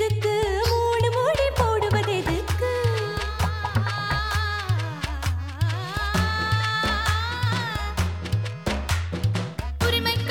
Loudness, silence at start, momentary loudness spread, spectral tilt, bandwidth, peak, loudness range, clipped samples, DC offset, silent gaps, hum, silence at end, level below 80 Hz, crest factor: -24 LUFS; 0 s; 6 LU; -5 dB/octave; 17.5 kHz; -8 dBFS; 3 LU; under 0.1%; 0.2%; none; none; 0 s; -34 dBFS; 16 dB